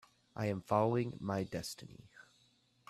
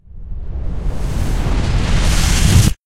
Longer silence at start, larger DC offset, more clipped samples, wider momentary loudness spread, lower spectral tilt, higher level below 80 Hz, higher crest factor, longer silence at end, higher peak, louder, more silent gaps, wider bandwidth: first, 0.35 s vs 0.1 s; neither; neither; first, 20 LU vs 16 LU; first, -6.5 dB/octave vs -4.5 dB/octave; second, -70 dBFS vs -18 dBFS; first, 22 dB vs 14 dB; first, 0.65 s vs 0.15 s; second, -16 dBFS vs 0 dBFS; second, -37 LUFS vs -17 LUFS; neither; second, 14 kHz vs 16 kHz